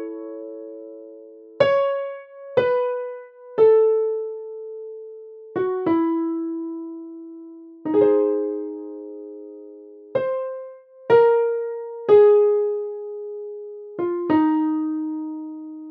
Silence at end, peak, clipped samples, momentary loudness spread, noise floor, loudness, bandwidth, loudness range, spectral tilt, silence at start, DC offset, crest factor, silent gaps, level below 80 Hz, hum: 0 s; -4 dBFS; under 0.1%; 22 LU; -43 dBFS; -21 LUFS; 5.4 kHz; 6 LU; -8.5 dB/octave; 0 s; under 0.1%; 18 dB; none; -70 dBFS; none